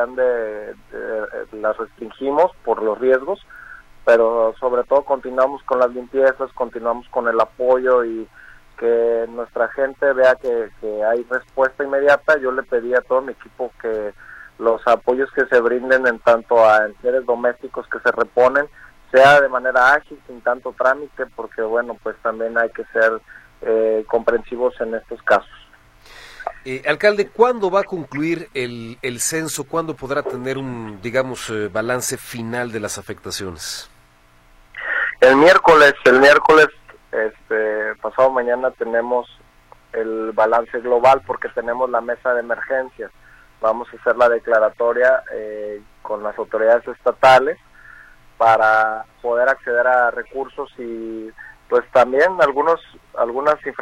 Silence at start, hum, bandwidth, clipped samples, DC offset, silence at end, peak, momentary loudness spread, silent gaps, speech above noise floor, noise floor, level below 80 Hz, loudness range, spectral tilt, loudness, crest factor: 0 s; none; 15.5 kHz; under 0.1%; under 0.1%; 0 s; -2 dBFS; 15 LU; none; 34 dB; -52 dBFS; -52 dBFS; 8 LU; -4 dB/octave; -18 LUFS; 18 dB